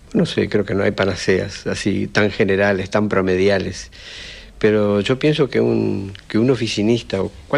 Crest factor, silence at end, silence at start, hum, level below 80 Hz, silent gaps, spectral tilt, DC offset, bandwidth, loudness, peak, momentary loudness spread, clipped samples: 14 dB; 0 s; 0.1 s; none; -44 dBFS; none; -6 dB/octave; under 0.1%; 11.5 kHz; -18 LUFS; -4 dBFS; 11 LU; under 0.1%